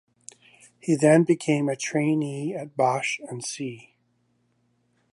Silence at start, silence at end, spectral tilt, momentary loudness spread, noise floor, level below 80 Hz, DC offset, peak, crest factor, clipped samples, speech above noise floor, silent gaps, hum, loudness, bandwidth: 0.85 s; 1.35 s; -5.5 dB/octave; 15 LU; -69 dBFS; -74 dBFS; under 0.1%; -6 dBFS; 20 dB; under 0.1%; 46 dB; none; 60 Hz at -60 dBFS; -24 LUFS; 11.5 kHz